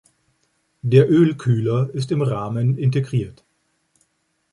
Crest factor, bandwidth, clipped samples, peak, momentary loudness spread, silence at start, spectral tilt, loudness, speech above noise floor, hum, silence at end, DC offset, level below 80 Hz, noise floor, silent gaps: 18 dB; 10.5 kHz; under 0.1%; -2 dBFS; 10 LU; 0.85 s; -8.5 dB/octave; -19 LUFS; 51 dB; none; 1.2 s; under 0.1%; -56 dBFS; -69 dBFS; none